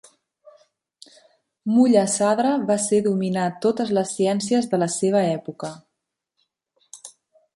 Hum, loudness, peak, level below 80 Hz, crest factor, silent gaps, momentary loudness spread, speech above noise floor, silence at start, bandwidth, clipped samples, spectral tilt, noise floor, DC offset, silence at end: none; -21 LUFS; -4 dBFS; -68 dBFS; 18 dB; none; 16 LU; 60 dB; 1.65 s; 11.5 kHz; under 0.1%; -5 dB/octave; -80 dBFS; under 0.1%; 0.45 s